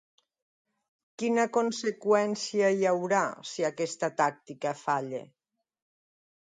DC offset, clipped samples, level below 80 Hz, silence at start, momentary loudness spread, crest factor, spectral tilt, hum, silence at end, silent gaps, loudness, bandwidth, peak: under 0.1%; under 0.1%; -80 dBFS; 1.2 s; 8 LU; 18 dB; -4.5 dB/octave; none; 1.25 s; none; -29 LUFS; 9.6 kHz; -12 dBFS